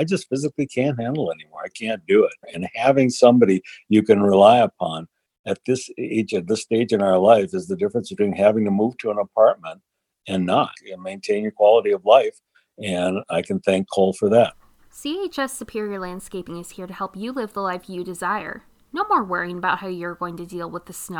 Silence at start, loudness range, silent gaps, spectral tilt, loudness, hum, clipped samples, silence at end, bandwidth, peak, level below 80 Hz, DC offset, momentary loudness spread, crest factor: 0 s; 9 LU; 5.39-5.44 s; -5.5 dB/octave; -20 LUFS; none; under 0.1%; 0 s; 16.5 kHz; 0 dBFS; -60 dBFS; under 0.1%; 16 LU; 20 dB